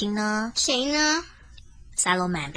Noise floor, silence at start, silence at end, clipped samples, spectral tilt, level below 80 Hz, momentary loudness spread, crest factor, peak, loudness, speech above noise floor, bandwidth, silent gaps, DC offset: -47 dBFS; 0 s; 0 s; under 0.1%; -2.5 dB/octave; -50 dBFS; 5 LU; 18 dB; -8 dBFS; -23 LUFS; 22 dB; 10.5 kHz; none; under 0.1%